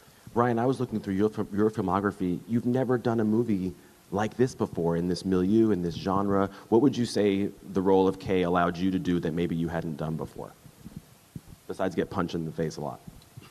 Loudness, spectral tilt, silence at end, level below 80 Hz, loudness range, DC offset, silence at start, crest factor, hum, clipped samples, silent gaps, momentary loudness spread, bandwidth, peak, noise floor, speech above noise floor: -27 LUFS; -7.5 dB/octave; 0 s; -56 dBFS; 8 LU; under 0.1%; 0.25 s; 20 dB; none; under 0.1%; none; 14 LU; 13.5 kHz; -8 dBFS; -47 dBFS; 21 dB